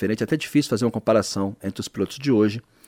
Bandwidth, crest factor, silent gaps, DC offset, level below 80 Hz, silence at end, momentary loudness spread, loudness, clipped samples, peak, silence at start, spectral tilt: 16 kHz; 16 dB; none; under 0.1%; -58 dBFS; 0.3 s; 8 LU; -23 LUFS; under 0.1%; -6 dBFS; 0 s; -5.5 dB/octave